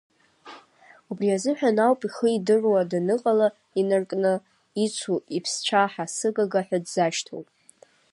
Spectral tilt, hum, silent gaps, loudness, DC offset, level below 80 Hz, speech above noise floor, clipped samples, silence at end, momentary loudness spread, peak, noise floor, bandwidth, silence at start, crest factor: -4.5 dB/octave; none; none; -24 LUFS; under 0.1%; -78 dBFS; 33 dB; under 0.1%; 0.7 s; 7 LU; -6 dBFS; -56 dBFS; 11.5 kHz; 0.45 s; 18 dB